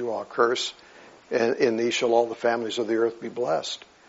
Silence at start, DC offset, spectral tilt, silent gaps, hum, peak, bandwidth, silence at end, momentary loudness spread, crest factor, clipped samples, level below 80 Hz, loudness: 0 s; under 0.1%; -2 dB/octave; none; none; -8 dBFS; 8 kHz; 0.3 s; 8 LU; 18 dB; under 0.1%; -74 dBFS; -25 LUFS